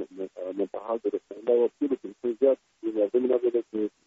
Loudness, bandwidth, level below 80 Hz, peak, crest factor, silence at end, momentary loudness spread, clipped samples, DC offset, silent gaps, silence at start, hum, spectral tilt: -28 LUFS; 7.2 kHz; -76 dBFS; -10 dBFS; 16 dB; 0.2 s; 9 LU; under 0.1%; under 0.1%; none; 0 s; none; -6 dB/octave